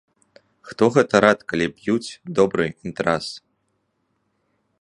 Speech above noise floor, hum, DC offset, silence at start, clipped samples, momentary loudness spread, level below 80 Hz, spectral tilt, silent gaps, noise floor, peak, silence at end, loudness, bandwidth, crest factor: 51 dB; none; under 0.1%; 0.65 s; under 0.1%; 11 LU; -56 dBFS; -5.5 dB/octave; none; -71 dBFS; 0 dBFS; 1.45 s; -20 LUFS; 11.5 kHz; 22 dB